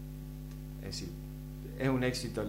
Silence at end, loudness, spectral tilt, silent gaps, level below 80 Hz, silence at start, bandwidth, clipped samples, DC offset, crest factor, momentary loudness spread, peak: 0 s; -37 LUFS; -5.5 dB/octave; none; -48 dBFS; 0 s; 16 kHz; under 0.1%; under 0.1%; 18 dB; 14 LU; -18 dBFS